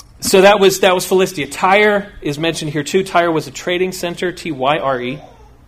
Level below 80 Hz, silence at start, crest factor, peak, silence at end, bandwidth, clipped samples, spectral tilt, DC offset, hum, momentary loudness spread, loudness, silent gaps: -46 dBFS; 0.2 s; 16 dB; 0 dBFS; 0.4 s; 16 kHz; under 0.1%; -4 dB/octave; under 0.1%; none; 11 LU; -15 LUFS; none